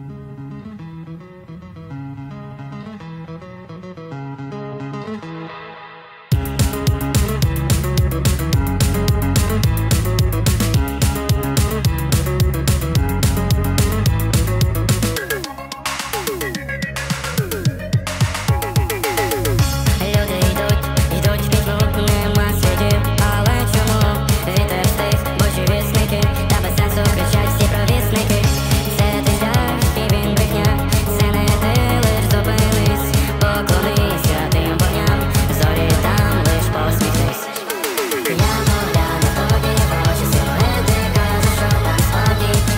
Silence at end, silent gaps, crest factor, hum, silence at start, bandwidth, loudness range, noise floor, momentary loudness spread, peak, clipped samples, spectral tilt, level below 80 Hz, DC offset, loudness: 0 s; none; 12 dB; none; 0 s; 16.5 kHz; 8 LU; -38 dBFS; 15 LU; -4 dBFS; under 0.1%; -5 dB/octave; -24 dBFS; under 0.1%; -17 LUFS